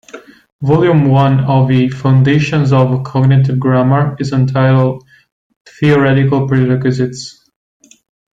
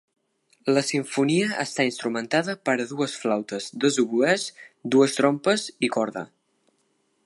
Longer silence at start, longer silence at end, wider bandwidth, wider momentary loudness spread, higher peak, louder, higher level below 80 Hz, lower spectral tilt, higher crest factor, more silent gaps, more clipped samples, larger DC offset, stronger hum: second, 0.15 s vs 0.65 s; about the same, 1.05 s vs 1 s; second, 7.8 kHz vs 11.5 kHz; about the same, 7 LU vs 9 LU; first, 0 dBFS vs -6 dBFS; first, -12 LUFS vs -24 LUFS; first, -46 dBFS vs -76 dBFS; first, -8 dB/octave vs -4 dB/octave; second, 12 dB vs 20 dB; first, 0.52-0.59 s, 5.32-5.50 s, 5.56-5.65 s vs none; neither; neither; neither